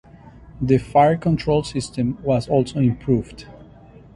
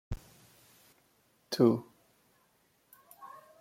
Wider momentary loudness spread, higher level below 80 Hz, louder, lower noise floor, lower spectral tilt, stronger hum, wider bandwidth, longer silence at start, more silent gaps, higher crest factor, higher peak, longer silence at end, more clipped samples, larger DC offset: second, 11 LU vs 24 LU; first, -42 dBFS vs -56 dBFS; first, -20 LUFS vs -31 LUFS; second, -45 dBFS vs -71 dBFS; about the same, -7.5 dB/octave vs -6.5 dB/octave; neither; second, 11.5 kHz vs 16.5 kHz; first, 0.25 s vs 0.1 s; neither; second, 18 dB vs 24 dB; first, -4 dBFS vs -12 dBFS; first, 0.65 s vs 0.35 s; neither; neither